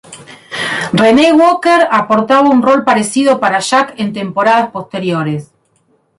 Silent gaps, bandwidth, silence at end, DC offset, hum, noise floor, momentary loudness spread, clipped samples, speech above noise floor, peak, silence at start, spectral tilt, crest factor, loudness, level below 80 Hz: none; 11.5 kHz; 0.75 s; under 0.1%; none; -57 dBFS; 11 LU; under 0.1%; 46 dB; 0 dBFS; 0.1 s; -5 dB/octave; 12 dB; -11 LUFS; -52 dBFS